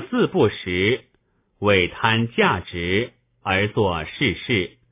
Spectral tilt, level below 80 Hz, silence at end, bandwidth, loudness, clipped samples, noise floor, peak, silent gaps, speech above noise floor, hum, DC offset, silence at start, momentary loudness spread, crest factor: -9.5 dB/octave; -44 dBFS; 0.25 s; 3.9 kHz; -21 LUFS; under 0.1%; -65 dBFS; -2 dBFS; none; 45 dB; none; under 0.1%; 0 s; 6 LU; 18 dB